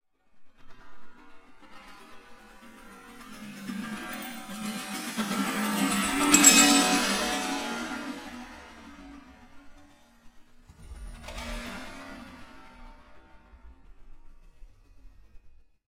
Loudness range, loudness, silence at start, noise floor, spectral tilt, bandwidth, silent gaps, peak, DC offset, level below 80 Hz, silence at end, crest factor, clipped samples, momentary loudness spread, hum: 23 LU; -24 LUFS; 0.35 s; -55 dBFS; -1.5 dB/octave; 16 kHz; none; -4 dBFS; under 0.1%; -52 dBFS; 0.35 s; 28 dB; under 0.1%; 30 LU; none